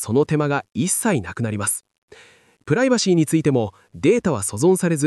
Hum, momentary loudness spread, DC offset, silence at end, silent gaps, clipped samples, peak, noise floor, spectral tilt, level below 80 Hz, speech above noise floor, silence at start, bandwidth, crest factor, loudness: none; 6 LU; under 0.1%; 0 s; 1.98-2.08 s; under 0.1%; -6 dBFS; -51 dBFS; -5 dB/octave; -58 dBFS; 31 dB; 0 s; 13.5 kHz; 14 dB; -20 LUFS